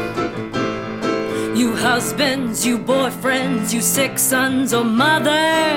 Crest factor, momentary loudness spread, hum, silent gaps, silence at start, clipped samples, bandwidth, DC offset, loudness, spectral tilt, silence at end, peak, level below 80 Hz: 14 dB; 8 LU; none; none; 0 s; under 0.1%; 17 kHz; under 0.1%; -18 LUFS; -3 dB/octave; 0 s; -4 dBFS; -50 dBFS